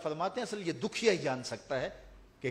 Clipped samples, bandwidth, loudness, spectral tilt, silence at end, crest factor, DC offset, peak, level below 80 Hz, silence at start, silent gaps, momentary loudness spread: under 0.1%; 12.5 kHz; -34 LUFS; -4.5 dB/octave; 0 s; 22 dB; under 0.1%; -12 dBFS; -62 dBFS; 0 s; none; 11 LU